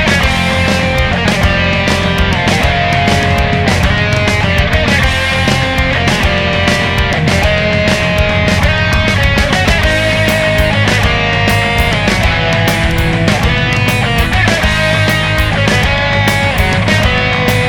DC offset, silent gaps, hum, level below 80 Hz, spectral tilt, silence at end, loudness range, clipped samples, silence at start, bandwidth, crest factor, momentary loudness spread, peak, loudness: under 0.1%; none; none; -20 dBFS; -5 dB/octave; 0 s; 1 LU; under 0.1%; 0 s; 19 kHz; 10 dB; 1 LU; 0 dBFS; -11 LUFS